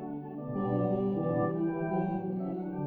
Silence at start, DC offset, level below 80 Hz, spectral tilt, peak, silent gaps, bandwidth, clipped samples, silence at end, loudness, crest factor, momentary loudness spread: 0 s; under 0.1%; -62 dBFS; -12 dB/octave; -18 dBFS; none; 3.9 kHz; under 0.1%; 0 s; -32 LUFS; 14 dB; 7 LU